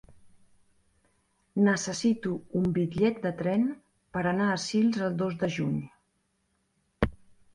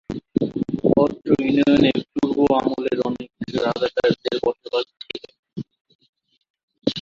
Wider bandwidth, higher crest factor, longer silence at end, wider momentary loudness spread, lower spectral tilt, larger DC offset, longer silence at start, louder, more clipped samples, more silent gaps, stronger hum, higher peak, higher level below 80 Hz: first, 11 kHz vs 7.4 kHz; about the same, 20 dB vs 20 dB; first, 0.4 s vs 0 s; second, 6 LU vs 17 LU; about the same, -6 dB/octave vs -7 dB/octave; neither; first, 0.25 s vs 0.1 s; second, -29 LUFS vs -21 LUFS; neither; second, none vs 5.39-5.43 s, 5.81-5.85 s, 5.95-5.99 s, 6.09-6.13 s, 6.50-6.54 s, 6.63-6.68 s; neither; second, -10 dBFS vs -2 dBFS; about the same, -50 dBFS vs -52 dBFS